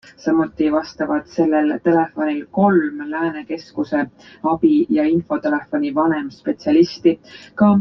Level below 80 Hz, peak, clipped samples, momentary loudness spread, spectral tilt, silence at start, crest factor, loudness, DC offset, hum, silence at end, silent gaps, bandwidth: -58 dBFS; -2 dBFS; under 0.1%; 9 LU; -8 dB/octave; 0.2 s; 16 dB; -19 LUFS; under 0.1%; none; 0 s; none; 6.4 kHz